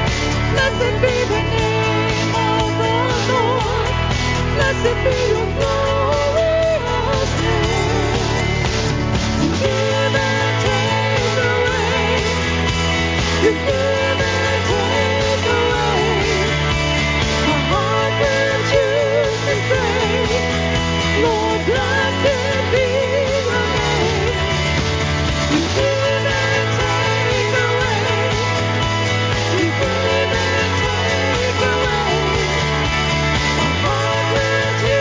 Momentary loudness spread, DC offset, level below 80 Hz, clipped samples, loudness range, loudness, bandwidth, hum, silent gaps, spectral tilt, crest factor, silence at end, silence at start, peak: 2 LU; under 0.1%; -28 dBFS; under 0.1%; 1 LU; -17 LUFS; 7.6 kHz; none; none; -4.5 dB/octave; 14 dB; 0 s; 0 s; -2 dBFS